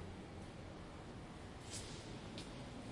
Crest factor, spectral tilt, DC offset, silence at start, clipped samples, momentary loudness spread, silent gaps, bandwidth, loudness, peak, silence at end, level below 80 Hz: 16 dB; -4.5 dB/octave; under 0.1%; 0 s; under 0.1%; 5 LU; none; 11.5 kHz; -51 LUFS; -34 dBFS; 0 s; -60 dBFS